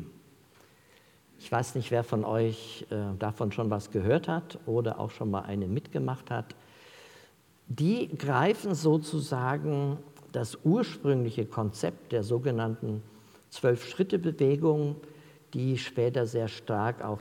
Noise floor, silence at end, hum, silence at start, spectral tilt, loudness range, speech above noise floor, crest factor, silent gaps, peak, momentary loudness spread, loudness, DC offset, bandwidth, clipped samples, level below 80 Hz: -61 dBFS; 0 s; none; 0 s; -7 dB/octave; 4 LU; 31 dB; 20 dB; none; -12 dBFS; 10 LU; -30 LUFS; under 0.1%; 16.5 kHz; under 0.1%; -72 dBFS